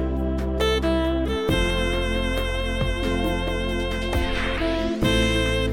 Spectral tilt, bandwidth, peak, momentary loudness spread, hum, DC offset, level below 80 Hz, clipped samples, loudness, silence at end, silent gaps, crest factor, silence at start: -5.5 dB/octave; 17 kHz; -8 dBFS; 5 LU; none; 0.2%; -28 dBFS; under 0.1%; -24 LUFS; 0 s; none; 14 dB; 0 s